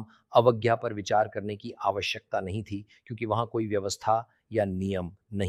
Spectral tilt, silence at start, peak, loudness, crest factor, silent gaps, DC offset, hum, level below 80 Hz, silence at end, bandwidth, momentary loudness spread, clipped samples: -5.5 dB/octave; 0 s; -6 dBFS; -29 LUFS; 22 dB; none; under 0.1%; none; -62 dBFS; 0 s; 14.5 kHz; 13 LU; under 0.1%